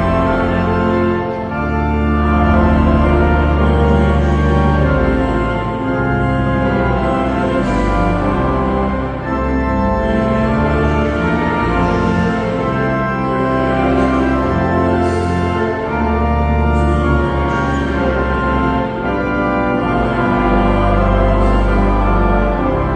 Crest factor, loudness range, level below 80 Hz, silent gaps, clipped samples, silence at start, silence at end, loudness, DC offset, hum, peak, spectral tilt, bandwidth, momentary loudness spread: 14 dB; 2 LU; -20 dBFS; none; under 0.1%; 0 s; 0 s; -15 LUFS; under 0.1%; none; 0 dBFS; -8.5 dB/octave; 9 kHz; 4 LU